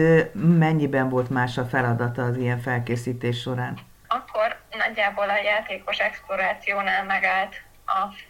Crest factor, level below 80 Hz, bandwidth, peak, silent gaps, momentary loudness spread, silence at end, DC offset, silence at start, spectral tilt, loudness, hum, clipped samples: 18 dB; -54 dBFS; 16 kHz; -6 dBFS; none; 9 LU; 0.05 s; under 0.1%; 0 s; -7 dB/octave; -24 LUFS; none; under 0.1%